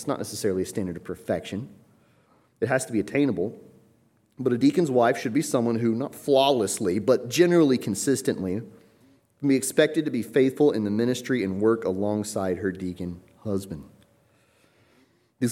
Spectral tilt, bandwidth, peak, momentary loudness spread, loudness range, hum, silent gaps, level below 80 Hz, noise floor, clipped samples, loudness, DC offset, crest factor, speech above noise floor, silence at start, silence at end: -5 dB/octave; 16.5 kHz; -6 dBFS; 12 LU; 7 LU; none; none; -64 dBFS; -63 dBFS; under 0.1%; -25 LUFS; under 0.1%; 18 dB; 39 dB; 0 s; 0 s